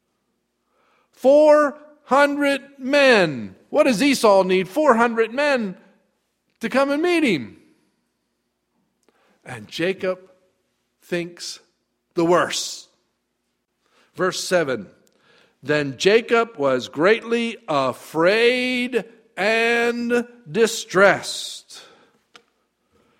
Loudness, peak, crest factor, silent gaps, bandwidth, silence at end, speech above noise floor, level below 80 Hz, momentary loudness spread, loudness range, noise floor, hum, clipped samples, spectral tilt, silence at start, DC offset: -19 LUFS; 0 dBFS; 22 dB; none; 16 kHz; 1.4 s; 55 dB; -68 dBFS; 15 LU; 10 LU; -74 dBFS; none; under 0.1%; -4 dB/octave; 1.25 s; under 0.1%